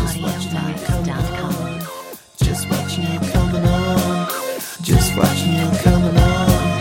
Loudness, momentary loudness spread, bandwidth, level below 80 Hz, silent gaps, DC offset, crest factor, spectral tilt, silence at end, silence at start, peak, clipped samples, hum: -18 LUFS; 10 LU; 17 kHz; -26 dBFS; none; under 0.1%; 16 dB; -5.5 dB/octave; 0 s; 0 s; 0 dBFS; under 0.1%; none